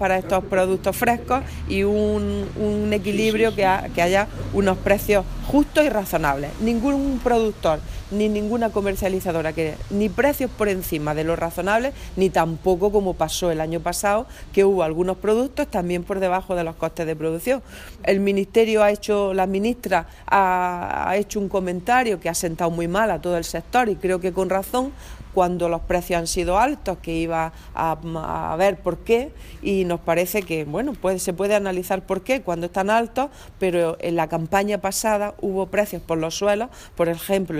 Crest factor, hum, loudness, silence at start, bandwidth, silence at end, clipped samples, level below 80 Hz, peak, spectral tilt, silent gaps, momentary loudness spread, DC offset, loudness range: 18 dB; none; -22 LUFS; 0 s; 16 kHz; 0 s; under 0.1%; -38 dBFS; -4 dBFS; -5 dB/octave; none; 6 LU; under 0.1%; 3 LU